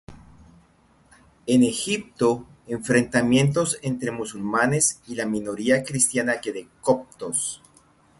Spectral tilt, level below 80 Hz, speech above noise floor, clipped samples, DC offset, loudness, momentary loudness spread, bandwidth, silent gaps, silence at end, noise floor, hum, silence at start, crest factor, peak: -4 dB/octave; -56 dBFS; 36 dB; under 0.1%; under 0.1%; -23 LUFS; 11 LU; 12 kHz; none; 0.65 s; -58 dBFS; none; 0.1 s; 20 dB; -4 dBFS